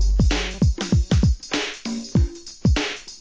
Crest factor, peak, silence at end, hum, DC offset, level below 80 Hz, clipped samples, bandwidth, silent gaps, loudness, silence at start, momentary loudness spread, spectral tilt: 14 dB; -6 dBFS; 0.05 s; none; under 0.1%; -24 dBFS; under 0.1%; 9.4 kHz; none; -22 LUFS; 0 s; 7 LU; -5.5 dB/octave